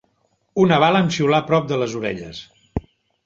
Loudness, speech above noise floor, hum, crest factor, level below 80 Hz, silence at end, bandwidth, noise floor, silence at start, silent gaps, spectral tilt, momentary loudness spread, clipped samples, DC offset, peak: -18 LUFS; 48 dB; none; 18 dB; -46 dBFS; 0.45 s; 7.6 kHz; -66 dBFS; 0.55 s; none; -6 dB/octave; 16 LU; under 0.1%; under 0.1%; -2 dBFS